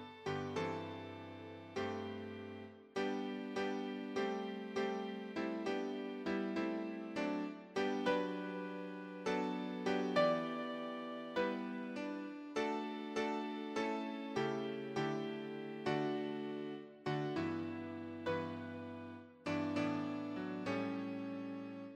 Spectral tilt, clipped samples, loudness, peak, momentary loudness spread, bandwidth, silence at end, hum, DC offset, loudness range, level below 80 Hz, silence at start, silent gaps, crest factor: -6 dB/octave; under 0.1%; -41 LUFS; -20 dBFS; 9 LU; 10.5 kHz; 0 s; none; under 0.1%; 4 LU; -80 dBFS; 0 s; none; 20 dB